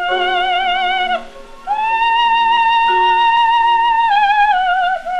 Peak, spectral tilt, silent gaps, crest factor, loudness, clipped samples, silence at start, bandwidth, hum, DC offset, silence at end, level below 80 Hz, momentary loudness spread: -2 dBFS; -1.5 dB/octave; none; 12 dB; -13 LUFS; under 0.1%; 0 s; 9.4 kHz; none; under 0.1%; 0 s; -42 dBFS; 6 LU